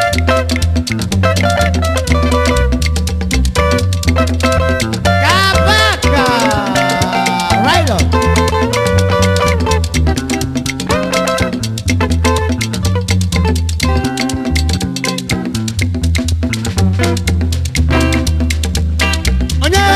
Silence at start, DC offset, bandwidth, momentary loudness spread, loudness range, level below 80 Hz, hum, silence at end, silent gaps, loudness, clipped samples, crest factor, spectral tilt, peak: 0 s; 0.1%; 15 kHz; 5 LU; 4 LU; -20 dBFS; none; 0 s; none; -13 LUFS; under 0.1%; 12 dB; -5 dB/octave; 0 dBFS